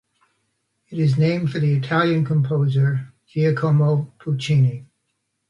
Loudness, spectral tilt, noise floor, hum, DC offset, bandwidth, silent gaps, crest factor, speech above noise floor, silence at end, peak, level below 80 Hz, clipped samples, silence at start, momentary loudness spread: -20 LUFS; -8 dB/octave; -74 dBFS; none; under 0.1%; 7.4 kHz; none; 14 dB; 55 dB; 0.65 s; -6 dBFS; -60 dBFS; under 0.1%; 0.9 s; 8 LU